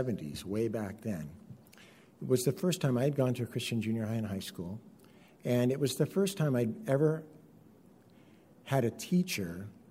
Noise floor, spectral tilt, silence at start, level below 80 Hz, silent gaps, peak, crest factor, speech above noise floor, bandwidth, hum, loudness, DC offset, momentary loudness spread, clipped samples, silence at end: -59 dBFS; -6 dB/octave; 0 s; -68 dBFS; none; -16 dBFS; 18 dB; 27 dB; 16 kHz; none; -33 LUFS; under 0.1%; 14 LU; under 0.1%; 0.2 s